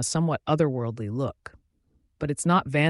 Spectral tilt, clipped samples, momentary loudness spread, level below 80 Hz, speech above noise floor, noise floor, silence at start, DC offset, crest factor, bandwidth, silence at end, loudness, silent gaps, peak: -5.5 dB/octave; under 0.1%; 10 LU; -56 dBFS; 43 dB; -68 dBFS; 0 s; under 0.1%; 18 dB; 11.5 kHz; 0 s; -26 LUFS; none; -8 dBFS